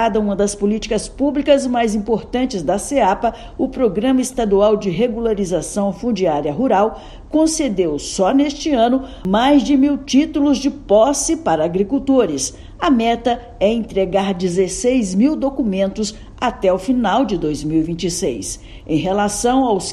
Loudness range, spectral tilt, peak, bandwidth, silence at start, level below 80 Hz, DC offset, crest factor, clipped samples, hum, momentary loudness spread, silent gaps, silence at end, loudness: 3 LU; -5 dB/octave; -2 dBFS; 13 kHz; 0 s; -38 dBFS; under 0.1%; 16 dB; under 0.1%; none; 6 LU; none; 0 s; -17 LUFS